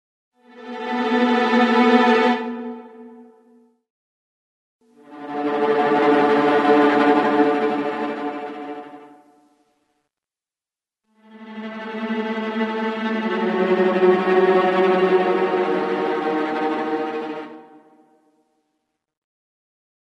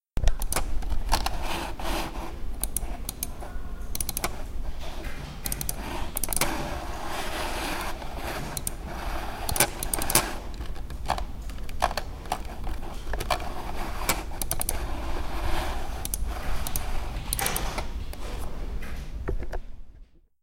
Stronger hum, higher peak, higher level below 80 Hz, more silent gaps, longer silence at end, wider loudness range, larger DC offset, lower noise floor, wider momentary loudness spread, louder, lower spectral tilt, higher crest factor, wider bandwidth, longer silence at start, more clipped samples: neither; about the same, -2 dBFS vs -2 dBFS; second, -68 dBFS vs -32 dBFS; first, 3.90-4.79 s vs none; first, 2.5 s vs 0.4 s; first, 15 LU vs 5 LU; neither; first, under -90 dBFS vs -50 dBFS; first, 17 LU vs 12 LU; first, -19 LUFS vs -31 LUFS; first, -6.5 dB/octave vs -3 dB/octave; second, 20 dB vs 26 dB; second, 9.6 kHz vs 17 kHz; first, 0.55 s vs 0.15 s; neither